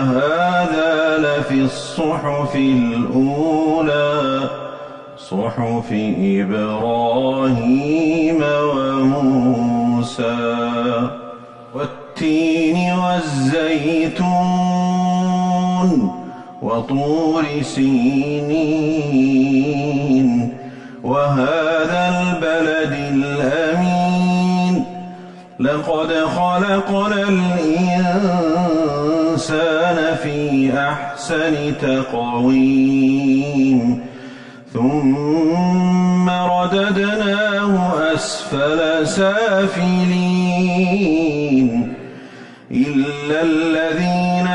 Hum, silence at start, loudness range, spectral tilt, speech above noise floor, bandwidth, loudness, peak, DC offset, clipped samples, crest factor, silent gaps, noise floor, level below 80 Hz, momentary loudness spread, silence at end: none; 0 s; 2 LU; -6.5 dB/octave; 21 dB; 10.5 kHz; -17 LUFS; -6 dBFS; under 0.1%; under 0.1%; 12 dB; none; -37 dBFS; -50 dBFS; 7 LU; 0 s